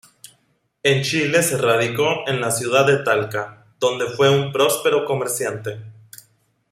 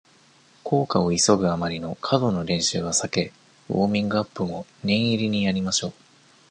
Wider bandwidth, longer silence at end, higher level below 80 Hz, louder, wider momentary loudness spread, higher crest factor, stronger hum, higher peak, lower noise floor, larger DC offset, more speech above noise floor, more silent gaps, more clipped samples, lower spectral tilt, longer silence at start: first, 16 kHz vs 10.5 kHz; first, 0.8 s vs 0.6 s; second, -62 dBFS vs -52 dBFS; first, -19 LUFS vs -23 LUFS; about the same, 11 LU vs 10 LU; about the same, 18 dB vs 20 dB; neither; about the same, -4 dBFS vs -4 dBFS; first, -64 dBFS vs -56 dBFS; neither; first, 45 dB vs 33 dB; neither; neither; about the same, -4 dB/octave vs -4.5 dB/octave; first, 0.85 s vs 0.65 s